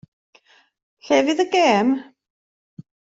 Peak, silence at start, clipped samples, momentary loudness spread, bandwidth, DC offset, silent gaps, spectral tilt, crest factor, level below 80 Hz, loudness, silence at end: -4 dBFS; 1.05 s; under 0.1%; 6 LU; 7.8 kHz; under 0.1%; 2.30-2.77 s; -4 dB/octave; 18 dB; -66 dBFS; -19 LUFS; 0.4 s